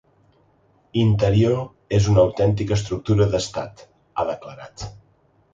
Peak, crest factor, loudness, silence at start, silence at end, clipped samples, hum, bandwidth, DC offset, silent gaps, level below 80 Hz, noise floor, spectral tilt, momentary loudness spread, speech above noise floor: -4 dBFS; 18 dB; -21 LUFS; 0.95 s; 0.6 s; under 0.1%; none; 7.8 kHz; under 0.1%; none; -40 dBFS; -60 dBFS; -7 dB/octave; 18 LU; 40 dB